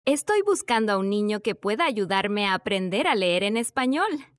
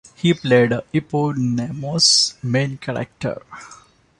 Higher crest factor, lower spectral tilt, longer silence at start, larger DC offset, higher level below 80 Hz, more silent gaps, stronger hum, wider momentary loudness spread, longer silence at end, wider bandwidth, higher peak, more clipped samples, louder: about the same, 14 dB vs 18 dB; about the same, -4 dB/octave vs -4 dB/octave; second, 0.05 s vs 0.2 s; neither; second, -68 dBFS vs -54 dBFS; neither; neither; second, 3 LU vs 15 LU; second, 0.15 s vs 0.45 s; about the same, 12 kHz vs 11.5 kHz; second, -10 dBFS vs -2 dBFS; neither; second, -24 LUFS vs -18 LUFS